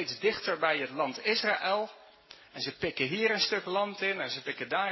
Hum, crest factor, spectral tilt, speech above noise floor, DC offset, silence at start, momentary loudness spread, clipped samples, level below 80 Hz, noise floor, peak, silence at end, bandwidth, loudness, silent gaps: none; 18 dB; -3.5 dB/octave; 24 dB; under 0.1%; 0 s; 8 LU; under 0.1%; -70 dBFS; -55 dBFS; -12 dBFS; 0 s; 6.2 kHz; -30 LUFS; none